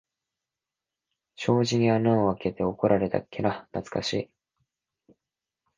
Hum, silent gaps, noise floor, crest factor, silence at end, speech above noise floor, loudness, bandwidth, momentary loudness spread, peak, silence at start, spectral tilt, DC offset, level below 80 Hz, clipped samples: none; none; -89 dBFS; 20 dB; 1.55 s; 64 dB; -26 LUFS; 9.6 kHz; 10 LU; -8 dBFS; 1.4 s; -6.5 dB/octave; under 0.1%; -58 dBFS; under 0.1%